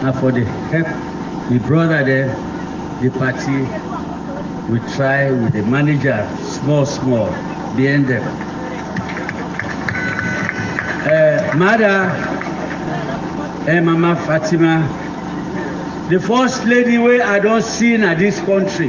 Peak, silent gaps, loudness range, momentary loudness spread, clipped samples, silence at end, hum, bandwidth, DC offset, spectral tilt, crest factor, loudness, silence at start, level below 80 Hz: 0 dBFS; none; 4 LU; 11 LU; under 0.1%; 0 s; none; 7.6 kHz; under 0.1%; -6.5 dB/octave; 16 dB; -17 LUFS; 0 s; -42 dBFS